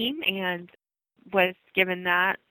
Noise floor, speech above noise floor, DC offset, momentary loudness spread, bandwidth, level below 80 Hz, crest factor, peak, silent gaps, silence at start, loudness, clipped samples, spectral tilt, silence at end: -58 dBFS; 32 dB; under 0.1%; 7 LU; 19.5 kHz; -70 dBFS; 22 dB; -6 dBFS; none; 0 s; -25 LUFS; under 0.1%; -8.5 dB/octave; 0.15 s